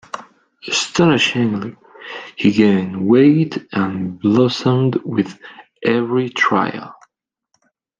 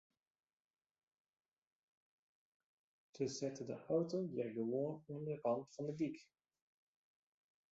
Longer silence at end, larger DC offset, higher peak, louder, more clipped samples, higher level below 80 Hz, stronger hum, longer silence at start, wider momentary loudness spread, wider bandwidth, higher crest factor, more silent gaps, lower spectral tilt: second, 1.1 s vs 1.5 s; neither; first, -2 dBFS vs -26 dBFS; first, -16 LUFS vs -43 LUFS; neither; first, -58 dBFS vs -86 dBFS; neither; second, 0.15 s vs 3.15 s; first, 19 LU vs 7 LU; first, 9.4 kHz vs 7.6 kHz; about the same, 16 dB vs 20 dB; neither; second, -5.5 dB/octave vs -7 dB/octave